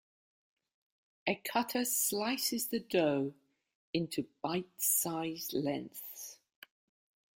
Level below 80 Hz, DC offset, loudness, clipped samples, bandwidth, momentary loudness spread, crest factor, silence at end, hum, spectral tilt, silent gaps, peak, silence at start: -78 dBFS; under 0.1%; -34 LUFS; under 0.1%; 17 kHz; 11 LU; 20 dB; 1.05 s; none; -3 dB/octave; 3.75-3.93 s; -16 dBFS; 1.25 s